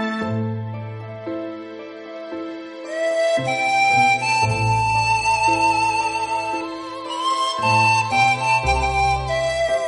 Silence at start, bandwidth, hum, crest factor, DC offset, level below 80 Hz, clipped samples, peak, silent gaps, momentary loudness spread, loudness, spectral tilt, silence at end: 0 s; 11.5 kHz; none; 16 dB; under 0.1%; -38 dBFS; under 0.1%; -4 dBFS; none; 16 LU; -19 LUFS; -4 dB/octave; 0 s